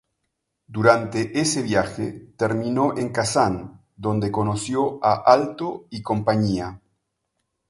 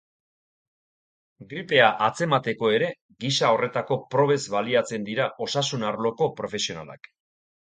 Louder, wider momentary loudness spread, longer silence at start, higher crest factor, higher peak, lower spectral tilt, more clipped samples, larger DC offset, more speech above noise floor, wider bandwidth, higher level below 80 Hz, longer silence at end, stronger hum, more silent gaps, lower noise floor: about the same, -22 LUFS vs -24 LUFS; first, 13 LU vs 10 LU; second, 0.7 s vs 1.4 s; about the same, 22 dB vs 24 dB; about the same, 0 dBFS vs -2 dBFS; first, -5.5 dB/octave vs -4 dB/octave; neither; neither; second, 56 dB vs over 66 dB; first, 11.5 kHz vs 9.6 kHz; first, -52 dBFS vs -68 dBFS; first, 0.95 s vs 0.75 s; neither; second, none vs 3.01-3.09 s; second, -77 dBFS vs under -90 dBFS